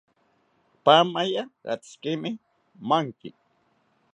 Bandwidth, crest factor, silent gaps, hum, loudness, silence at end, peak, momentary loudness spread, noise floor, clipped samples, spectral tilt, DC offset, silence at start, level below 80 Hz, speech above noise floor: 10.5 kHz; 24 dB; none; none; -24 LUFS; 0.85 s; -4 dBFS; 21 LU; -67 dBFS; under 0.1%; -5 dB/octave; under 0.1%; 0.85 s; -78 dBFS; 43 dB